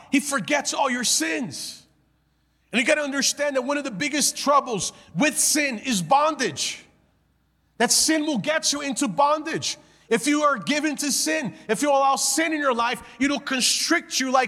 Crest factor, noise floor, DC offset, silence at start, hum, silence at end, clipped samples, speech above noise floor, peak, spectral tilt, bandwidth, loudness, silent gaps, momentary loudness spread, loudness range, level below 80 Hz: 16 dB; -66 dBFS; under 0.1%; 0.1 s; none; 0 s; under 0.1%; 43 dB; -6 dBFS; -2 dB/octave; 16.5 kHz; -22 LUFS; none; 8 LU; 2 LU; -64 dBFS